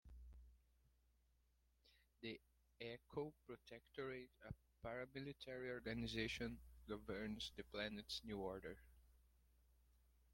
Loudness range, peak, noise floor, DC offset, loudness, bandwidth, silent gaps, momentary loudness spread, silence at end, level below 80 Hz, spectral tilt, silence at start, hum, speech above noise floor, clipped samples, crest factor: 8 LU; -30 dBFS; -81 dBFS; under 0.1%; -52 LUFS; 16.5 kHz; none; 13 LU; 0.2 s; -68 dBFS; -5 dB/octave; 0.05 s; none; 29 dB; under 0.1%; 22 dB